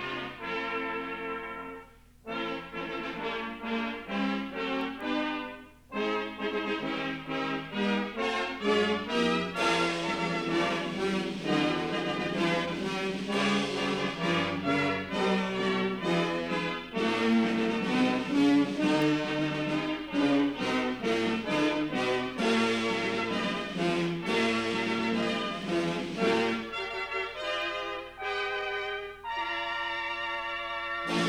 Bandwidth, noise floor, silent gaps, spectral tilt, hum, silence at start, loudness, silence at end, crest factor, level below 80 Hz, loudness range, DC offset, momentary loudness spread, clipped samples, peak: 14 kHz; -52 dBFS; none; -5 dB/octave; none; 0 s; -30 LUFS; 0 s; 16 dB; -60 dBFS; 6 LU; under 0.1%; 8 LU; under 0.1%; -14 dBFS